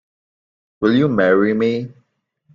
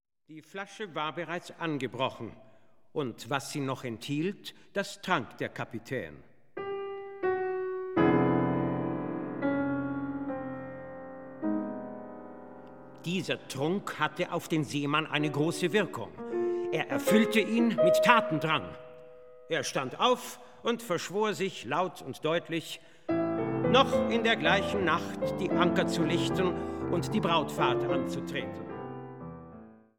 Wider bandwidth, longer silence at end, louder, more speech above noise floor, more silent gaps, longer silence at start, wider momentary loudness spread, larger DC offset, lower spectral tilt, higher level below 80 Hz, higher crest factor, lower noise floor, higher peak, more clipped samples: second, 7.2 kHz vs 18 kHz; first, 0.65 s vs 0.2 s; first, -17 LUFS vs -30 LUFS; first, 50 dB vs 22 dB; neither; first, 0.8 s vs 0.3 s; second, 10 LU vs 17 LU; second, under 0.1% vs 0.2%; first, -8.5 dB/octave vs -5 dB/octave; about the same, -58 dBFS vs -62 dBFS; second, 16 dB vs 26 dB; first, -66 dBFS vs -52 dBFS; about the same, -2 dBFS vs -4 dBFS; neither